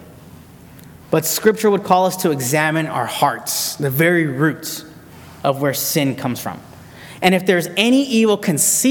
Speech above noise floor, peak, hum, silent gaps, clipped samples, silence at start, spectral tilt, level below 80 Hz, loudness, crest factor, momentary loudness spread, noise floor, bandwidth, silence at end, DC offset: 24 dB; 0 dBFS; none; none; under 0.1%; 0 s; -4 dB/octave; -58 dBFS; -17 LUFS; 18 dB; 10 LU; -41 dBFS; 19 kHz; 0 s; under 0.1%